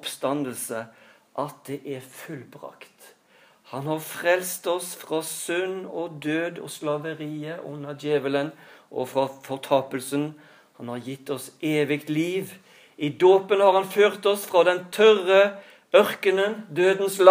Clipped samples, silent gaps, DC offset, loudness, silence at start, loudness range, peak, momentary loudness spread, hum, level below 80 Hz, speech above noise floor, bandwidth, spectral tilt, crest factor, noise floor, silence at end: under 0.1%; none; under 0.1%; -24 LUFS; 0.05 s; 11 LU; 0 dBFS; 18 LU; none; -84 dBFS; 34 dB; 15.5 kHz; -4.5 dB/octave; 24 dB; -58 dBFS; 0 s